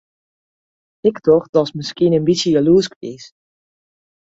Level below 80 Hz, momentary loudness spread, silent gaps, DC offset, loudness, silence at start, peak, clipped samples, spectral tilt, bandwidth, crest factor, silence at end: -54 dBFS; 12 LU; 1.49-1.53 s, 2.96-3.01 s; under 0.1%; -16 LUFS; 1.05 s; -2 dBFS; under 0.1%; -6 dB/octave; 8 kHz; 16 dB; 1.05 s